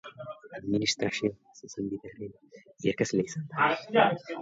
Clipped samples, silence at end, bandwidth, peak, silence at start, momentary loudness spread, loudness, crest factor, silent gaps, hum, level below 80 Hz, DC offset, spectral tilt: under 0.1%; 0 s; 8 kHz; -10 dBFS; 0.05 s; 19 LU; -29 LUFS; 22 dB; none; none; -66 dBFS; under 0.1%; -4.5 dB/octave